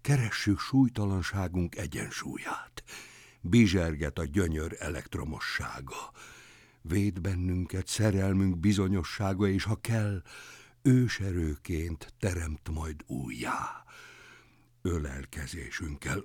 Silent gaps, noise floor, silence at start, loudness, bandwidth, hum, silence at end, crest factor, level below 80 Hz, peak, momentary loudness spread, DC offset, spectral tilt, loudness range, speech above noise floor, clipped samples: none; -60 dBFS; 0.05 s; -31 LUFS; 17.5 kHz; none; 0 s; 18 dB; -48 dBFS; -12 dBFS; 18 LU; under 0.1%; -6 dB/octave; 7 LU; 30 dB; under 0.1%